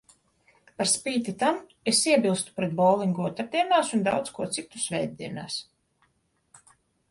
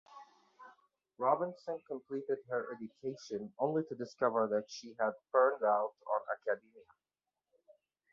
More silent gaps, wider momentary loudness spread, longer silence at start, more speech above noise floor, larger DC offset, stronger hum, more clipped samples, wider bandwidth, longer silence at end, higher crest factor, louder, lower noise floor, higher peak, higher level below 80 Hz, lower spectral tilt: neither; about the same, 11 LU vs 13 LU; first, 0.8 s vs 0.1 s; second, 45 dB vs over 54 dB; neither; neither; neither; first, 11.5 kHz vs 7.2 kHz; first, 1.5 s vs 1.3 s; about the same, 20 dB vs 22 dB; first, -26 LUFS vs -36 LUFS; second, -71 dBFS vs under -90 dBFS; first, -8 dBFS vs -16 dBFS; first, -68 dBFS vs -86 dBFS; about the same, -3.5 dB/octave vs -4.5 dB/octave